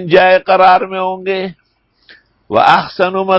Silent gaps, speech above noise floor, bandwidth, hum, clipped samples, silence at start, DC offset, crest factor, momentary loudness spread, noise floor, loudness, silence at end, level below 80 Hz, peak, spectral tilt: none; 41 dB; 8 kHz; none; 0.3%; 0 s; under 0.1%; 12 dB; 10 LU; -52 dBFS; -11 LUFS; 0 s; -52 dBFS; 0 dBFS; -6.5 dB/octave